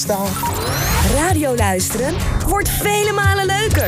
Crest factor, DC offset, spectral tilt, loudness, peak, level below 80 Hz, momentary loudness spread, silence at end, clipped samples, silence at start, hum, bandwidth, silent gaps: 12 dB; under 0.1%; -4 dB/octave; -17 LUFS; -4 dBFS; -26 dBFS; 4 LU; 0 s; under 0.1%; 0 s; none; 16 kHz; none